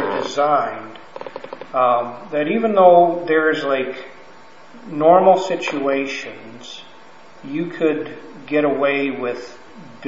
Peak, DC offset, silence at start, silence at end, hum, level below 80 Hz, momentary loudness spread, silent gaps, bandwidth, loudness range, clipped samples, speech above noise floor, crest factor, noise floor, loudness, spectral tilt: 0 dBFS; 0.7%; 0 s; 0 s; none; -70 dBFS; 22 LU; none; 7.8 kHz; 7 LU; under 0.1%; 27 dB; 20 dB; -45 dBFS; -18 LUFS; -5.5 dB/octave